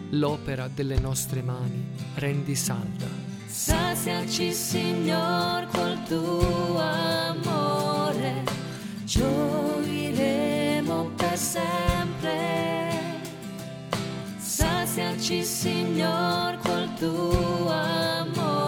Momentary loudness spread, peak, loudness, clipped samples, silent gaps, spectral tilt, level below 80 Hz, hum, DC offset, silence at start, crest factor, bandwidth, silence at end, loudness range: 8 LU; -8 dBFS; -27 LUFS; under 0.1%; none; -4.5 dB/octave; -40 dBFS; none; under 0.1%; 0 s; 18 dB; 18.5 kHz; 0 s; 3 LU